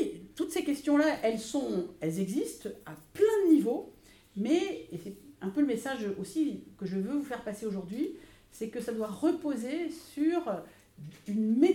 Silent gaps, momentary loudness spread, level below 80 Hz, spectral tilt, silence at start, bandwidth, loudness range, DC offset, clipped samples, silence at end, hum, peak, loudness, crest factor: none; 17 LU; -66 dBFS; -6 dB/octave; 0 s; 17 kHz; 5 LU; under 0.1%; under 0.1%; 0 s; none; -12 dBFS; -32 LUFS; 20 dB